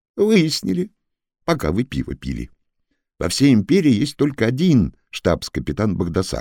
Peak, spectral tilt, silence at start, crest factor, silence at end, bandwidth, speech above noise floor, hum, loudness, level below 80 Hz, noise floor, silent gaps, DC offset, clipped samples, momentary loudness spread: -4 dBFS; -6 dB/octave; 0.15 s; 16 dB; 0 s; 17.5 kHz; 54 dB; none; -19 LUFS; -40 dBFS; -72 dBFS; none; under 0.1%; under 0.1%; 13 LU